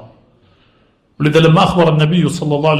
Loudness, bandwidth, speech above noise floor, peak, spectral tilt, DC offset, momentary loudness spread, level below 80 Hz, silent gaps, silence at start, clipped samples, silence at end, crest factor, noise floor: -12 LUFS; 11.5 kHz; 43 dB; 0 dBFS; -6.5 dB/octave; under 0.1%; 6 LU; -42 dBFS; none; 0 s; under 0.1%; 0 s; 14 dB; -55 dBFS